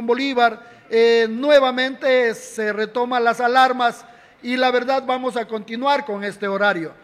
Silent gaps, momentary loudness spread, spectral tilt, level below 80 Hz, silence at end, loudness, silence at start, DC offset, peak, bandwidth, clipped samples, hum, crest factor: none; 10 LU; -4 dB/octave; -66 dBFS; 0.1 s; -19 LUFS; 0 s; under 0.1%; -4 dBFS; 13.5 kHz; under 0.1%; none; 16 dB